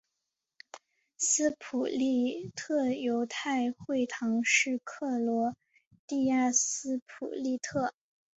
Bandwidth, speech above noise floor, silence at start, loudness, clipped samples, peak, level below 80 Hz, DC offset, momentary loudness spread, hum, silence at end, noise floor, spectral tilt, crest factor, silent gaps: 8.4 kHz; 56 dB; 0.75 s; -30 LUFS; under 0.1%; -14 dBFS; -74 dBFS; under 0.1%; 11 LU; none; 0.45 s; -86 dBFS; -2.5 dB/octave; 18 dB; 5.87-5.91 s, 5.99-6.08 s, 7.02-7.06 s